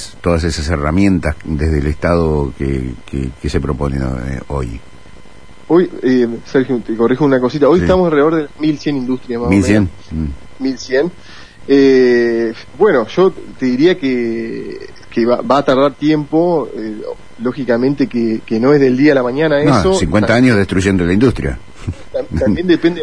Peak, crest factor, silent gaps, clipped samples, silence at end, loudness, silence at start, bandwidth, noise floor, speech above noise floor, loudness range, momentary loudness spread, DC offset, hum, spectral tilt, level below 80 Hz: 0 dBFS; 14 dB; none; under 0.1%; 0 s; -14 LUFS; 0 s; 10.5 kHz; -41 dBFS; 27 dB; 6 LU; 12 LU; 2%; none; -7 dB/octave; -30 dBFS